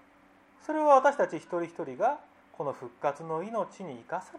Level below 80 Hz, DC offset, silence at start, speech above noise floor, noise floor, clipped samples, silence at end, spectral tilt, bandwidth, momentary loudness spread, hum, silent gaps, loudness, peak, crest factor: -80 dBFS; under 0.1%; 0.7 s; 31 dB; -60 dBFS; under 0.1%; 0 s; -6 dB/octave; 10.5 kHz; 16 LU; none; none; -29 LUFS; -10 dBFS; 22 dB